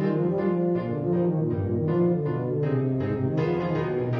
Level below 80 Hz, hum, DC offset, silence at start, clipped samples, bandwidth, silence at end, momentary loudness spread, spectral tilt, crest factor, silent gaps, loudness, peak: -54 dBFS; none; under 0.1%; 0 s; under 0.1%; 5.8 kHz; 0 s; 3 LU; -11 dB/octave; 10 dB; none; -26 LUFS; -14 dBFS